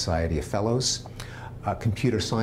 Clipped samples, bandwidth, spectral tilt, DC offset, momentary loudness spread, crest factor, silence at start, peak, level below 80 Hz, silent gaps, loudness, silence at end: under 0.1%; 15.5 kHz; -5 dB/octave; under 0.1%; 14 LU; 16 dB; 0 s; -12 dBFS; -40 dBFS; none; -27 LUFS; 0 s